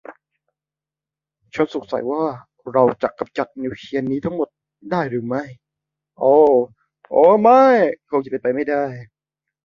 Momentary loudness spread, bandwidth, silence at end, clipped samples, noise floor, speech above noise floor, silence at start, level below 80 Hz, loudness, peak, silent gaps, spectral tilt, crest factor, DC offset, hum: 15 LU; 7.2 kHz; 0.6 s; under 0.1%; -89 dBFS; 71 dB; 0.1 s; -62 dBFS; -18 LUFS; -2 dBFS; none; -8 dB/octave; 18 dB; under 0.1%; none